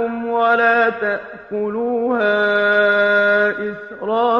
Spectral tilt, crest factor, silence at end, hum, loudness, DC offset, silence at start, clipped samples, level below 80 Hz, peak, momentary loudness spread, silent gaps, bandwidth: -6 dB/octave; 14 dB; 0 s; none; -16 LUFS; under 0.1%; 0 s; under 0.1%; -60 dBFS; -4 dBFS; 12 LU; none; 7 kHz